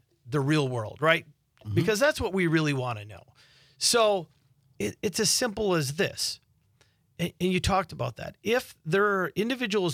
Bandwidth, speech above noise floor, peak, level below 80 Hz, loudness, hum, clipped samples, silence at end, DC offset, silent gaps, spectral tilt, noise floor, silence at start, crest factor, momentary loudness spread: 16.5 kHz; 39 dB; -6 dBFS; -52 dBFS; -27 LUFS; none; under 0.1%; 0 s; under 0.1%; none; -4 dB/octave; -66 dBFS; 0.25 s; 22 dB; 11 LU